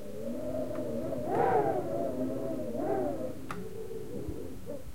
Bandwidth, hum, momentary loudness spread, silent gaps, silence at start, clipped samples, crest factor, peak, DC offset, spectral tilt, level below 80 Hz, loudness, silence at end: 16.5 kHz; none; 13 LU; none; 0 s; under 0.1%; 18 dB; -16 dBFS; 1%; -7.5 dB/octave; -56 dBFS; -34 LUFS; 0 s